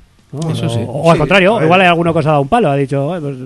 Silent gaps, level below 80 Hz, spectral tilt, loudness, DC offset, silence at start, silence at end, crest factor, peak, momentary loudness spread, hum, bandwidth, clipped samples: none; -40 dBFS; -6.5 dB/octave; -12 LUFS; under 0.1%; 0.35 s; 0 s; 12 dB; 0 dBFS; 10 LU; none; 12 kHz; 0.1%